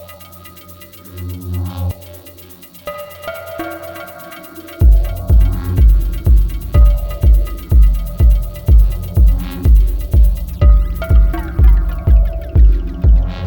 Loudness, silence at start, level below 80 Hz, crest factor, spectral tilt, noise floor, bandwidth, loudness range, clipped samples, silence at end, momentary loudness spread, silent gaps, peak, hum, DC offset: -15 LUFS; 0 s; -12 dBFS; 12 dB; -8 dB/octave; -37 dBFS; 18 kHz; 12 LU; under 0.1%; 0 s; 20 LU; none; 0 dBFS; none; under 0.1%